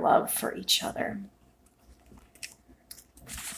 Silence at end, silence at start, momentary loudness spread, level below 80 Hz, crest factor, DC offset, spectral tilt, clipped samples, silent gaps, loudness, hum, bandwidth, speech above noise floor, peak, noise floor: 0 s; 0 s; 24 LU; -58 dBFS; 24 dB; under 0.1%; -2 dB/octave; under 0.1%; none; -28 LUFS; none; 16 kHz; 34 dB; -8 dBFS; -62 dBFS